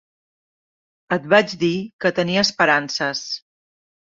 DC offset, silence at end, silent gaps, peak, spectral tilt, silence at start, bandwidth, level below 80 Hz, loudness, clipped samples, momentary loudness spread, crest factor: under 0.1%; 0.75 s; 1.93-1.99 s; -2 dBFS; -4 dB/octave; 1.1 s; 7.6 kHz; -62 dBFS; -19 LUFS; under 0.1%; 10 LU; 20 dB